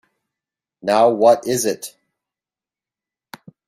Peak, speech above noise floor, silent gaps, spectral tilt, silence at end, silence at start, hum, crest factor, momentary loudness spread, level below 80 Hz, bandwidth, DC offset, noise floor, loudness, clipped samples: -2 dBFS; over 74 dB; none; -4 dB/octave; 1.8 s; 0.85 s; none; 20 dB; 16 LU; -68 dBFS; 15.5 kHz; under 0.1%; under -90 dBFS; -17 LUFS; under 0.1%